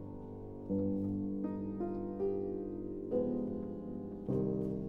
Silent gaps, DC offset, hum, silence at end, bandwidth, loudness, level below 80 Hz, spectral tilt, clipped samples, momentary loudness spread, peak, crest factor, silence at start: none; under 0.1%; none; 0 s; 3.1 kHz; -38 LUFS; -56 dBFS; -12 dB/octave; under 0.1%; 8 LU; -24 dBFS; 14 dB; 0 s